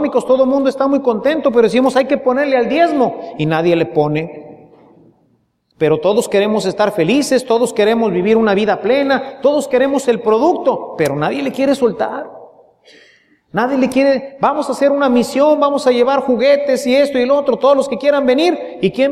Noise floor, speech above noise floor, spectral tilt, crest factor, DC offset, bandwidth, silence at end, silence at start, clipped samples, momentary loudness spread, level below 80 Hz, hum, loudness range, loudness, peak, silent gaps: -60 dBFS; 46 dB; -5.5 dB/octave; 14 dB; under 0.1%; 14 kHz; 0 s; 0 s; under 0.1%; 6 LU; -56 dBFS; none; 5 LU; -14 LUFS; -2 dBFS; none